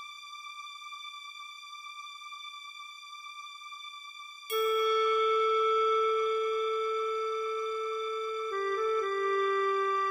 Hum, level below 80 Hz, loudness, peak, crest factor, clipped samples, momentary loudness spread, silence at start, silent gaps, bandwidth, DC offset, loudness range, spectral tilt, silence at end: none; -74 dBFS; -29 LUFS; -20 dBFS; 12 dB; under 0.1%; 17 LU; 0 s; none; 15.5 kHz; under 0.1%; 15 LU; -1 dB/octave; 0 s